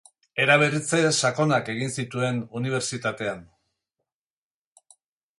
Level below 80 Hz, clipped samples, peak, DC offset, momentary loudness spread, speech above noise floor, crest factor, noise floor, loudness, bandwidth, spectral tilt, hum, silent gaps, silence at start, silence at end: -66 dBFS; under 0.1%; -6 dBFS; under 0.1%; 12 LU; over 66 dB; 22 dB; under -90 dBFS; -24 LUFS; 11.5 kHz; -4 dB/octave; none; none; 0.35 s; 1.95 s